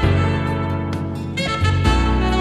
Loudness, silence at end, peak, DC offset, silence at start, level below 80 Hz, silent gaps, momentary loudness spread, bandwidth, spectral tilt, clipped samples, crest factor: -20 LUFS; 0 s; -4 dBFS; under 0.1%; 0 s; -24 dBFS; none; 7 LU; 11.5 kHz; -6.5 dB/octave; under 0.1%; 14 dB